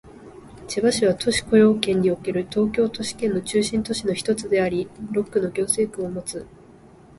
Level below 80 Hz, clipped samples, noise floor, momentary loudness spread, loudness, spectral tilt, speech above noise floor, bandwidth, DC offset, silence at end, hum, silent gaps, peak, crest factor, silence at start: -50 dBFS; under 0.1%; -48 dBFS; 11 LU; -22 LUFS; -4.5 dB/octave; 26 dB; 12 kHz; under 0.1%; 0.7 s; none; none; -2 dBFS; 20 dB; 0.05 s